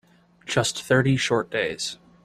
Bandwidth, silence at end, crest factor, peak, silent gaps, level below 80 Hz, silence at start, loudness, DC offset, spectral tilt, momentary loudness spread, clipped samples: 14 kHz; 0.3 s; 18 dB; -6 dBFS; none; -58 dBFS; 0.45 s; -23 LUFS; under 0.1%; -4.5 dB/octave; 10 LU; under 0.1%